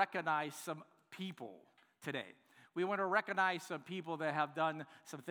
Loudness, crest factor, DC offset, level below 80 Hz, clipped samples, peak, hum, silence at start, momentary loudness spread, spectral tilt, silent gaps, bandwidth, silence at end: -39 LUFS; 22 dB; under 0.1%; under -90 dBFS; under 0.1%; -18 dBFS; none; 0 s; 15 LU; -4.5 dB/octave; none; over 20 kHz; 0 s